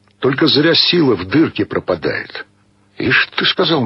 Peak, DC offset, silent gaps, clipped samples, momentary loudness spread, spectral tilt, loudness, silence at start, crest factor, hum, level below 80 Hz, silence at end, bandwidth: 0 dBFS; under 0.1%; none; under 0.1%; 12 LU; -7.5 dB/octave; -14 LUFS; 0.2 s; 16 dB; none; -52 dBFS; 0 s; 6 kHz